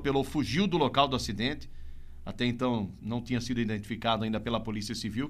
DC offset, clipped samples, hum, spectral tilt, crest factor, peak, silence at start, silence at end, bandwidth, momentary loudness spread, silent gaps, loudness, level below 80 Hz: under 0.1%; under 0.1%; none; -5.5 dB/octave; 22 dB; -8 dBFS; 0 s; 0 s; 15 kHz; 9 LU; none; -30 LUFS; -46 dBFS